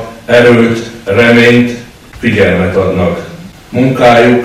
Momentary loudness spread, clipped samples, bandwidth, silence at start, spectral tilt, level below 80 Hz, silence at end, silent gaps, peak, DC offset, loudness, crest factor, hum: 13 LU; 2%; 14 kHz; 0 s; -6.5 dB/octave; -38 dBFS; 0 s; none; 0 dBFS; under 0.1%; -8 LUFS; 8 dB; none